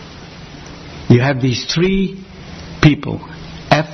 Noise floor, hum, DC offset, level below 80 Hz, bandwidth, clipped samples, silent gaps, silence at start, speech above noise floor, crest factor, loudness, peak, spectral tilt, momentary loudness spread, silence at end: -35 dBFS; none; under 0.1%; -36 dBFS; 6.4 kHz; under 0.1%; none; 0 s; 20 dB; 16 dB; -15 LUFS; 0 dBFS; -6 dB/octave; 21 LU; 0 s